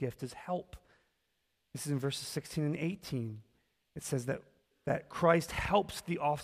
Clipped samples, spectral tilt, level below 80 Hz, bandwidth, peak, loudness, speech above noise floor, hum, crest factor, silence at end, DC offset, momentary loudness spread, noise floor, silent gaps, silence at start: under 0.1%; -5.5 dB/octave; -58 dBFS; 15.5 kHz; -14 dBFS; -35 LUFS; 46 dB; none; 22 dB; 0 s; under 0.1%; 15 LU; -81 dBFS; none; 0 s